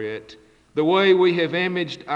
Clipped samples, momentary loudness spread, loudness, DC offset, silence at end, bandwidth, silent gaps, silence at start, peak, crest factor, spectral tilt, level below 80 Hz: under 0.1%; 15 LU; -20 LUFS; under 0.1%; 0 s; 7.4 kHz; none; 0 s; -6 dBFS; 16 dB; -6.5 dB/octave; -64 dBFS